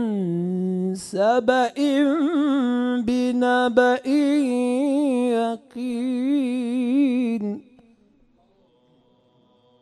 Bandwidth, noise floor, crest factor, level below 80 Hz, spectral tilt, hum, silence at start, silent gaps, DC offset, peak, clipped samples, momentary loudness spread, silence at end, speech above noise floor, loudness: 12 kHz; -60 dBFS; 18 dB; -64 dBFS; -6 dB/octave; none; 0 s; none; under 0.1%; -4 dBFS; under 0.1%; 8 LU; 2.2 s; 40 dB; -22 LUFS